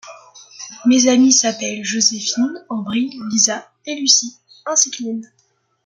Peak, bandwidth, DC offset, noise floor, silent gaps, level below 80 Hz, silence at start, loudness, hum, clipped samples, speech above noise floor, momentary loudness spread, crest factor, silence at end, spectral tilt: 0 dBFS; 10.5 kHz; under 0.1%; -63 dBFS; none; -68 dBFS; 0.05 s; -16 LUFS; none; under 0.1%; 46 dB; 17 LU; 18 dB; 0.6 s; -1.5 dB/octave